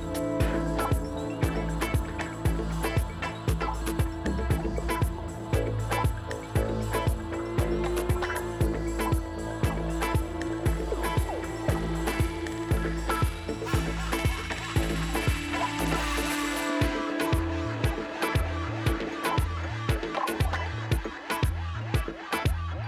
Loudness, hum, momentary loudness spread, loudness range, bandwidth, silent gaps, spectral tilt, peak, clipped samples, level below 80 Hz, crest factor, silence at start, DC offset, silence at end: -29 LUFS; none; 3 LU; 2 LU; 15 kHz; none; -5.5 dB/octave; -12 dBFS; under 0.1%; -34 dBFS; 16 dB; 0 s; under 0.1%; 0 s